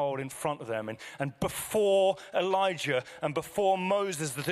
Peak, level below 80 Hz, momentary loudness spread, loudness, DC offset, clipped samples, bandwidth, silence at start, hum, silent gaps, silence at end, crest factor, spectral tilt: -16 dBFS; -62 dBFS; 9 LU; -30 LUFS; under 0.1%; under 0.1%; 15.5 kHz; 0 s; none; none; 0 s; 14 dB; -4.5 dB/octave